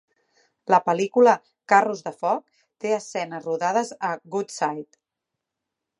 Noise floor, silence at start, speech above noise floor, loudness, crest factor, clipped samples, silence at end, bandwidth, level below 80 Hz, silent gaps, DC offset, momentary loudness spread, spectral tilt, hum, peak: -84 dBFS; 0.65 s; 62 dB; -23 LUFS; 22 dB; under 0.1%; 1.15 s; 11.5 kHz; -82 dBFS; none; under 0.1%; 12 LU; -4.5 dB/octave; none; -2 dBFS